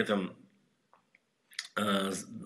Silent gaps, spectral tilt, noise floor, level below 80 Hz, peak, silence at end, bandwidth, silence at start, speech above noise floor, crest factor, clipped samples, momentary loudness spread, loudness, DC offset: none; -4 dB/octave; -71 dBFS; -78 dBFS; -14 dBFS; 0 s; 14.5 kHz; 0 s; 38 dB; 22 dB; under 0.1%; 12 LU; -34 LUFS; under 0.1%